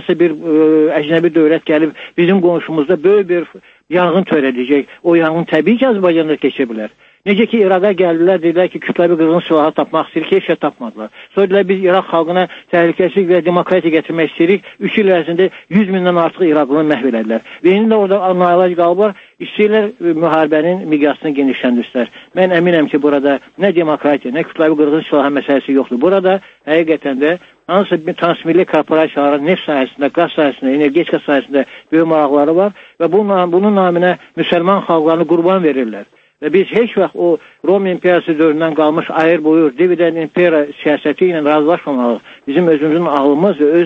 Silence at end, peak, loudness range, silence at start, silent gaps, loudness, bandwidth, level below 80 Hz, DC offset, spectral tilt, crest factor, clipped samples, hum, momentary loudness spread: 0 s; 0 dBFS; 1 LU; 0 s; none; -13 LUFS; 5.6 kHz; -62 dBFS; under 0.1%; -8.5 dB/octave; 12 dB; under 0.1%; none; 5 LU